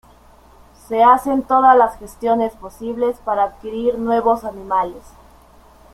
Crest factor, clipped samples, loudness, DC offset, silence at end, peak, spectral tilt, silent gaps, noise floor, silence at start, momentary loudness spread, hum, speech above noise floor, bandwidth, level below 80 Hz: 16 dB; under 0.1%; -17 LUFS; under 0.1%; 0.95 s; -2 dBFS; -5.5 dB/octave; none; -47 dBFS; 0.9 s; 12 LU; none; 30 dB; 15 kHz; -48 dBFS